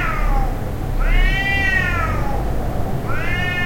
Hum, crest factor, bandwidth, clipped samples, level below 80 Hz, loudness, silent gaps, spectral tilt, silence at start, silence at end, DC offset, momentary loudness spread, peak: none; 12 dB; 16.5 kHz; under 0.1%; -20 dBFS; -20 LUFS; none; -5.5 dB/octave; 0 s; 0 s; under 0.1%; 8 LU; -4 dBFS